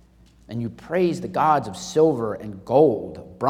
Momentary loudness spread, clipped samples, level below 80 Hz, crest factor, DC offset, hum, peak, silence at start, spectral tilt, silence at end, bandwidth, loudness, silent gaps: 14 LU; under 0.1%; -56 dBFS; 18 dB; under 0.1%; none; -4 dBFS; 0.5 s; -6.5 dB/octave; 0 s; 13.5 kHz; -22 LUFS; none